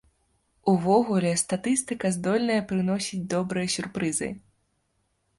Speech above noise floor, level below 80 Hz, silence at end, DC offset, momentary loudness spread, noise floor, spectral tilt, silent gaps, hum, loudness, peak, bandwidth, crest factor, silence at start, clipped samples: 47 dB; -62 dBFS; 1 s; under 0.1%; 7 LU; -73 dBFS; -5 dB/octave; none; none; -26 LUFS; -8 dBFS; 11.5 kHz; 18 dB; 0.65 s; under 0.1%